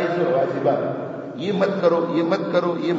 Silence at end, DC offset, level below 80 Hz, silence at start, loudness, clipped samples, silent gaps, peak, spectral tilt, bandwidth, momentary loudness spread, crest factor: 0 s; under 0.1%; -70 dBFS; 0 s; -21 LUFS; under 0.1%; none; -4 dBFS; -5.5 dB/octave; 7.6 kHz; 8 LU; 16 dB